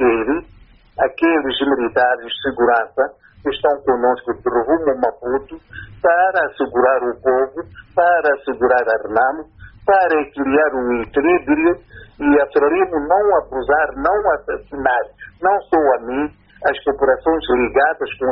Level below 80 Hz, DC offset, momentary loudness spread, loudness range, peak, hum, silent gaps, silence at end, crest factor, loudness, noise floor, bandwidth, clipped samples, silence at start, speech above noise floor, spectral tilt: -46 dBFS; under 0.1%; 9 LU; 2 LU; -2 dBFS; none; none; 0 s; 14 dB; -17 LUFS; -46 dBFS; 5.4 kHz; under 0.1%; 0 s; 29 dB; -2.5 dB/octave